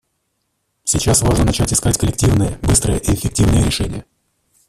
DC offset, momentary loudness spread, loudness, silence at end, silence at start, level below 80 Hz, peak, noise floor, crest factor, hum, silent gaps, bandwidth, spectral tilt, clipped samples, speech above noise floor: under 0.1%; 7 LU; -16 LUFS; 0.65 s; 0.85 s; -26 dBFS; -2 dBFS; -69 dBFS; 16 dB; none; none; 15.5 kHz; -4.5 dB/octave; under 0.1%; 54 dB